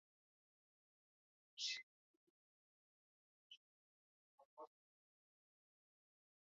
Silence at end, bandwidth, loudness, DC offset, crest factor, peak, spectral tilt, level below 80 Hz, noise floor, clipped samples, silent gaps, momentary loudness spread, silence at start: 1.9 s; 6 kHz; -47 LUFS; under 0.1%; 28 dB; -34 dBFS; 5.5 dB/octave; under -90 dBFS; under -90 dBFS; under 0.1%; 1.83-3.50 s, 3.57-4.38 s, 4.45-4.57 s; 20 LU; 1.55 s